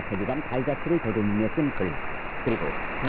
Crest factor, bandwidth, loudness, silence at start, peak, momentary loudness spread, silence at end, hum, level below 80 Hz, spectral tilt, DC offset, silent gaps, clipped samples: 14 dB; 4.6 kHz; -28 LUFS; 0 s; -12 dBFS; 5 LU; 0 s; none; -44 dBFS; -11.5 dB/octave; under 0.1%; none; under 0.1%